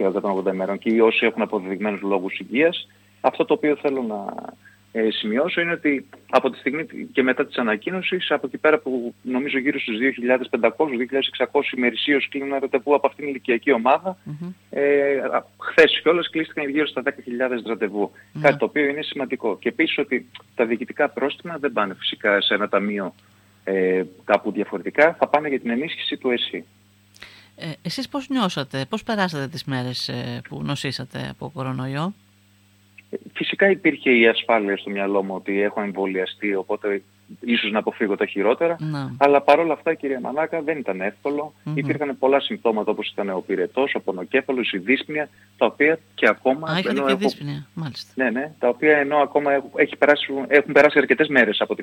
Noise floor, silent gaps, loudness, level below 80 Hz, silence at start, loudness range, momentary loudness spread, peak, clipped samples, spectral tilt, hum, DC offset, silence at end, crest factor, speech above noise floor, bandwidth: -56 dBFS; none; -21 LUFS; -68 dBFS; 0 s; 6 LU; 11 LU; -2 dBFS; under 0.1%; -6 dB/octave; none; under 0.1%; 0 s; 20 dB; 35 dB; 16.5 kHz